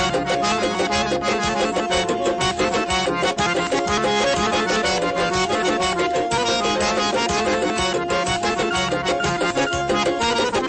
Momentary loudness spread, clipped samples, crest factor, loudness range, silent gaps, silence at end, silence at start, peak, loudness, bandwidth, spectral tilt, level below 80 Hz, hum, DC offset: 2 LU; under 0.1%; 12 dB; 1 LU; none; 0 s; 0 s; -8 dBFS; -20 LUFS; 8.8 kHz; -3.5 dB/octave; -42 dBFS; none; under 0.1%